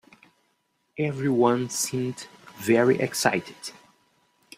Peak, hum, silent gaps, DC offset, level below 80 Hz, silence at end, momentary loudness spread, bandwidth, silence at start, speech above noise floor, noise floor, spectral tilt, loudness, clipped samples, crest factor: -4 dBFS; none; none; under 0.1%; -68 dBFS; 0.85 s; 19 LU; 16 kHz; 0.95 s; 48 dB; -72 dBFS; -4.5 dB/octave; -24 LUFS; under 0.1%; 24 dB